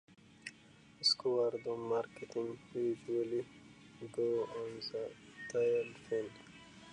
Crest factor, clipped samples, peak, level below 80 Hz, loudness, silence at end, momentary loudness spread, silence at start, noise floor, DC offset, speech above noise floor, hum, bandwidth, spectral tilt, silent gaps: 18 dB; under 0.1%; -20 dBFS; -76 dBFS; -37 LUFS; 0 s; 19 LU; 0.1 s; -62 dBFS; under 0.1%; 24 dB; none; 10.5 kHz; -4 dB/octave; none